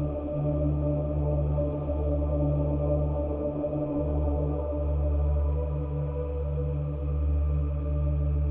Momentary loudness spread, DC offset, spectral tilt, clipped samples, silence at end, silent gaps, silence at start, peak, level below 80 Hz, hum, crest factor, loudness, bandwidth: 4 LU; under 0.1%; -12 dB/octave; under 0.1%; 0 s; none; 0 s; -14 dBFS; -30 dBFS; none; 12 dB; -29 LUFS; 2.8 kHz